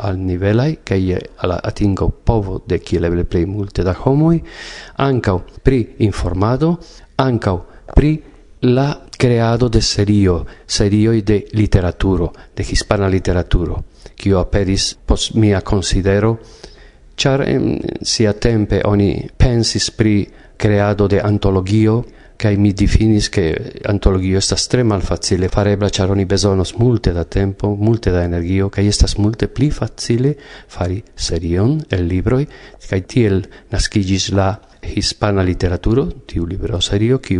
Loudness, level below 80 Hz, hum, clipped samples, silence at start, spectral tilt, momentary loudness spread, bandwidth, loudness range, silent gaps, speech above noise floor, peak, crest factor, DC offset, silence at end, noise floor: -16 LUFS; -26 dBFS; none; under 0.1%; 0 s; -6 dB/octave; 8 LU; 11 kHz; 3 LU; none; 26 dB; 0 dBFS; 16 dB; under 0.1%; 0 s; -41 dBFS